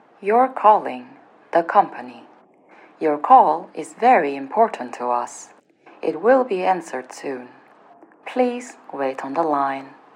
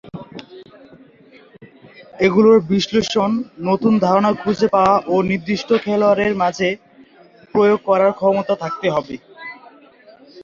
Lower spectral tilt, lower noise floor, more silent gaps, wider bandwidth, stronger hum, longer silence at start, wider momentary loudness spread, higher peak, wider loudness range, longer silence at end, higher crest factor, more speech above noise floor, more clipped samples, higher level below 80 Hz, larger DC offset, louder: about the same, -5 dB/octave vs -6 dB/octave; about the same, -51 dBFS vs -48 dBFS; neither; first, 11 kHz vs 7.4 kHz; neither; first, 0.2 s vs 0.05 s; about the same, 17 LU vs 19 LU; about the same, 0 dBFS vs -2 dBFS; about the same, 6 LU vs 4 LU; first, 0.25 s vs 0 s; about the same, 20 dB vs 16 dB; about the same, 31 dB vs 32 dB; neither; second, under -90 dBFS vs -54 dBFS; neither; about the same, -19 LUFS vs -17 LUFS